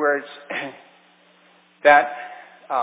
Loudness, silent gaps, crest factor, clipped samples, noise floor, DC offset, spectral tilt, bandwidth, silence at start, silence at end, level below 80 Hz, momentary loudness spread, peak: -20 LUFS; none; 22 dB; under 0.1%; -55 dBFS; under 0.1%; -7 dB/octave; 4 kHz; 0 s; 0 s; -86 dBFS; 20 LU; 0 dBFS